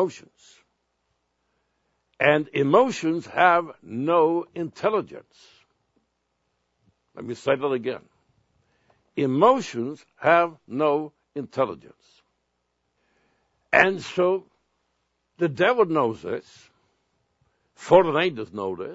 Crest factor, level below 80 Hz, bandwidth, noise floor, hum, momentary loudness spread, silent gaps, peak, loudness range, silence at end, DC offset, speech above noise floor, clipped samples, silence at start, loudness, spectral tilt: 24 dB; -68 dBFS; 8 kHz; -75 dBFS; none; 15 LU; none; 0 dBFS; 9 LU; 0 s; under 0.1%; 52 dB; under 0.1%; 0 s; -23 LUFS; -6 dB/octave